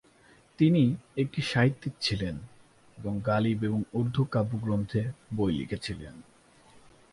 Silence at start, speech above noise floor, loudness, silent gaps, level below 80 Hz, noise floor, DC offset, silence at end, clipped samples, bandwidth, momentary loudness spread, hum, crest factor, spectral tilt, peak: 0.6 s; 31 dB; -29 LUFS; none; -54 dBFS; -59 dBFS; under 0.1%; 0.9 s; under 0.1%; 11.5 kHz; 11 LU; none; 18 dB; -7 dB/octave; -12 dBFS